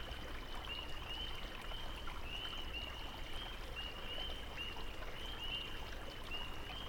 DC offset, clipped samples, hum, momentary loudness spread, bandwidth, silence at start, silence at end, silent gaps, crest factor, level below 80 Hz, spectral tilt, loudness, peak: under 0.1%; under 0.1%; none; 4 LU; 19 kHz; 0 s; 0 s; none; 14 dB; -48 dBFS; -3.5 dB/octave; -45 LUFS; -30 dBFS